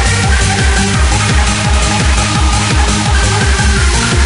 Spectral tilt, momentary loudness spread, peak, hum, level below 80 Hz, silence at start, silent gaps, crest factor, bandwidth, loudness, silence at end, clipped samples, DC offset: -3.5 dB/octave; 1 LU; 0 dBFS; none; -14 dBFS; 0 s; none; 10 dB; 11 kHz; -11 LUFS; 0 s; under 0.1%; under 0.1%